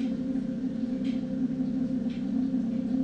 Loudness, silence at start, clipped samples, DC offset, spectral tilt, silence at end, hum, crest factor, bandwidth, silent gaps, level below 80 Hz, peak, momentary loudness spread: -30 LUFS; 0 s; under 0.1%; under 0.1%; -8.5 dB/octave; 0 s; none; 12 dB; 7.2 kHz; none; -56 dBFS; -18 dBFS; 2 LU